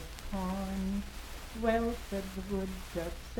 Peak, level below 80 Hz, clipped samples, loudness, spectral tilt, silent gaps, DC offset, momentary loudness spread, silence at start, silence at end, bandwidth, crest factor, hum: -16 dBFS; -44 dBFS; under 0.1%; -36 LUFS; -6 dB/octave; none; under 0.1%; 10 LU; 0 s; 0 s; 18.5 kHz; 18 dB; none